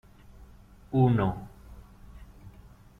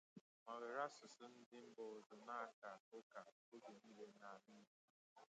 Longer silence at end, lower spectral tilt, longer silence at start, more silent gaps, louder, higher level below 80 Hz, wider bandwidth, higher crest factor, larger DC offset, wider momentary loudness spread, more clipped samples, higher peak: first, 0.5 s vs 0.05 s; first, -10 dB/octave vs -4 dB/octave; first, 0.4 s vs 0.15 s; second, none vs 0.21-0.46 s, 1.46-1.51 s, 2.06-2.10 s, 2.53-2.62 s, 2.80-2.92 s, 3.03-3.10 s, 3.32-3.52 s, 4.67-5.16 s; first, -26 LUFS vs -56 LUFS; first, -50 dBFS vs under -90 dBFS; second, 4.1 kHz vs 8.8 kHz; about the same, 20 dB vs 22 dB; neither; first, 27 LU vs 14 LU; neither; first, -12 dBFS vs -34 dBFS